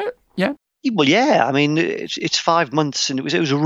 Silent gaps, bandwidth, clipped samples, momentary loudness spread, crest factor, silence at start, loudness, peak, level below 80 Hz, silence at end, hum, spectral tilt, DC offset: none; 8.6 kHz; under 0.1%; 8 LU; 16 dB; 0 s; -18 LUFS; -2 dBFS; -68 dBFS; 0 s; none; -4 dB/octave; under 0.1%